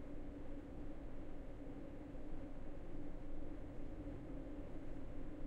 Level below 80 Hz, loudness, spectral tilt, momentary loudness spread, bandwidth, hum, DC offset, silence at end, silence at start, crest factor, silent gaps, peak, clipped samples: -50 dBFS; -53 LUFS; -8.5 dB/octave; 2 LU; 4 kHz; none; under 0.1%; 0 s; 0 s; 12 dB; none; -34 dBFS; under 0.1%